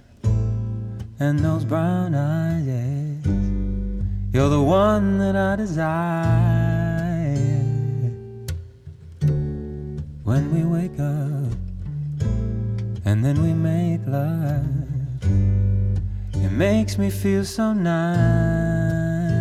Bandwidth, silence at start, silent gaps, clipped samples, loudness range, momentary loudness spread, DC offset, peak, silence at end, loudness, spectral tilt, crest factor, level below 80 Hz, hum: 14 kHz; 0.25 s; none; under 0.1%; 5 LU; 10 LU; under 0.1%; -6 dBFS; 0 s; -22 LUFS; -8 dB/octave; 14 dB; -34 dBFS; none